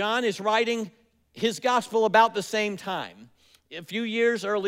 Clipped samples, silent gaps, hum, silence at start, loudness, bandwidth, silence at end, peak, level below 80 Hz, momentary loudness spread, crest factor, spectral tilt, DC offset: under 0.1%; none; none; 0 s; -25 LUFS; 16 kHz; 0 s; -8 dBFS; -76 dBFS; 15 LU; 18 dB; -3.5 dB/octave; under 0.1%